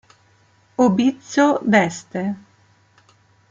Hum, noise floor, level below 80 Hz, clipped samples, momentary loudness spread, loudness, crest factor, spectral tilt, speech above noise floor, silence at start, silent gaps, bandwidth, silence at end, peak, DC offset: none; -57 dBFS; -64 dBFS; under 0.1%; 12 LU; -19 LUFS; 18 dB; -5.5 dB/octave; 39 dB; 0.8 s; none; 7.8 kHz; 1.15 s; -2 dBFS; under 0.1%